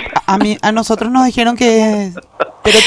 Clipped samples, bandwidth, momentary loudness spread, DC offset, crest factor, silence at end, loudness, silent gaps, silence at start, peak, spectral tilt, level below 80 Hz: 0.4%; 11 kHz; 10 LU; under 0.1%; 12 dB; 0 s; -13 LUFS; none; 0 s; 0 dBFS; -3.5 dB/octave; -40 dBFS